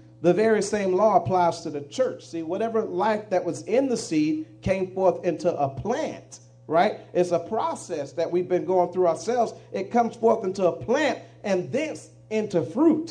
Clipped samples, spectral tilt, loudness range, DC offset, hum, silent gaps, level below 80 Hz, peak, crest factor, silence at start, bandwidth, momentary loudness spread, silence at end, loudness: under 0.1%; -6 dB/octave; 2 LU; under 0.1%; none; none; -58 dBFS; -6 dBFS; 18 dB; 0.2 s; 10 kHz; 9 LU; 0 s; -25 LUFS